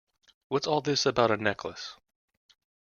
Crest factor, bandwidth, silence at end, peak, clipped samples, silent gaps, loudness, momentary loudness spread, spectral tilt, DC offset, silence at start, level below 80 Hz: 22 dB; 7.2 kHz; 1 s; -8 dBFS; under 0.1%; none; -28 LUFS; 15 LU; -4 dB/octave; under 0.1%; 0.5 s; -66 dBFS